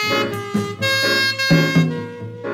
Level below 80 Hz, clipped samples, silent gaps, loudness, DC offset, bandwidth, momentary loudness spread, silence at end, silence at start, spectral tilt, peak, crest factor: -50 dBFS; under 0.1%; none; -17 LUFS; under 0.1%; 15.5 kHz; 13 LU; 0 s; 0 s; -4.5 dB/octave; -4 dBFS; 16 dB